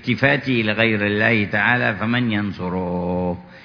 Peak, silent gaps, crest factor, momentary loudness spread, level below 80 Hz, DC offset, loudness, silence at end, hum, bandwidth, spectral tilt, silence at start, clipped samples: -2 dBFS; none; 18 dB; 7 LU; -50 dBFS; under 0.1%; -19 LUFS; 0 s; none; 5.4 kHz; -8 dB/octave; 0 s; under 0.1%